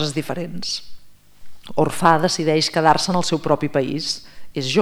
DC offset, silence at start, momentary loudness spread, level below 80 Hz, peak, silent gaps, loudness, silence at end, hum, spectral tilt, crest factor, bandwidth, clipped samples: under 0.1%; 0 s; 12 LU; -52 dBFS; 0 dBFS; none; -20 LUFS; 0 s; 50 Hz at -45 dBFS; -4.5 dB/octave; 20 dB; over 20 kHz; under 0.1%